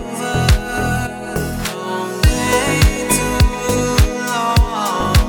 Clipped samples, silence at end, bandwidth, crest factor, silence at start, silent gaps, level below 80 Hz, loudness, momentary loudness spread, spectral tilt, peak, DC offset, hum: under 0.1%; 0 s; over 20 kHz; 16 dB; 0 s; none; -20 dBFS; -17 LUFS; 8 LU; -4.5 dB/octave; 0 dBFS; under 0.1%; none